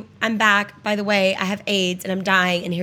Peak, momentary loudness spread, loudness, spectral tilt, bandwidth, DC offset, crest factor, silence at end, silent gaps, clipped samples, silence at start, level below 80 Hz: -2 dBFS; 7 LU; -19 LUFS; -4 dB/octave; 17.5 kHz; under 0.1%; 18 dB; 0 s; none; under 0.1%; 0 s; -64 dBFS